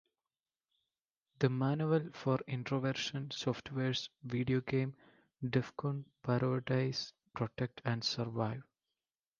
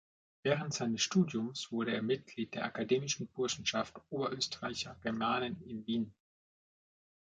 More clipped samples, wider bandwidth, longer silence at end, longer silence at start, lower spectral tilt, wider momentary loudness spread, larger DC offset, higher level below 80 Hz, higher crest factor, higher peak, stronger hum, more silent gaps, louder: neither; second, 7.2 kHz vs 9.2 kHz; second, 0.75 s vs 1.15 s; first, 1.4 s vs 0.45 s; first, -6 dB/octave vs -4 dB/octave; about the same, 7 LU vs 7 LU; neither; about the same, -70 dBFS vs -70 dBFS; about the same, 22 dB vs 20 dB; about the same, -16 dBFS vs -16 dBFS; neither; neither; about the same, -36 LUFS vs -36 LUFS